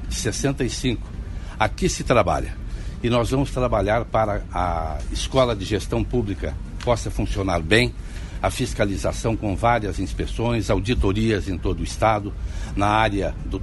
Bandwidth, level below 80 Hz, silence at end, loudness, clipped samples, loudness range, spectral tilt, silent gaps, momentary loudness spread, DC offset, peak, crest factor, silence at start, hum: 11.5 kHz; -30 dBFS; 0 s; -23 LUFS; under 0.1%; 1 LU; -5.5 dB/octave; none; 10 LU; under 0.1%; -2 dBFS; 20 dB; 0 s; none